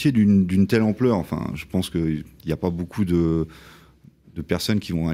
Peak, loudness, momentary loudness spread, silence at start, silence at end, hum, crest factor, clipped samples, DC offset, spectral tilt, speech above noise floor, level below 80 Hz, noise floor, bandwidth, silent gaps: -6 dBFS; -22 LUFS; 12 LU; 0 s; 0 s; none; 16 dB; under 0.1%; under 0.1%; -7 dB/octave; 30 dB; -46 dBFS; -51 dBFS; 15.5 kHz; none